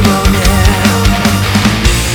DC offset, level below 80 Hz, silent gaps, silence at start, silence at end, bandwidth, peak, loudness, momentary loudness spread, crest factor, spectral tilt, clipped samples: under 0.1%; -16 dBFS; none; 0 s; 0 s; over 20 kHz; 0 dBFS; -10 LUFS; 1 LU; 10 dB; -4.5 dB/octave; 0.3%